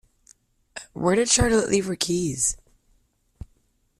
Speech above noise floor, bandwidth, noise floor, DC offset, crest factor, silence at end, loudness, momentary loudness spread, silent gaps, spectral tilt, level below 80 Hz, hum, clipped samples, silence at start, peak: 44 dB; 14.5 kHz; -66 dBFS; under 0.1%; 20 dB; 1.45 s; -22 LUFS; 20 LU; none; -3.5 dB/octave; -42 dBFS; none; under 0.1%; 0.75 s; -6 dBFS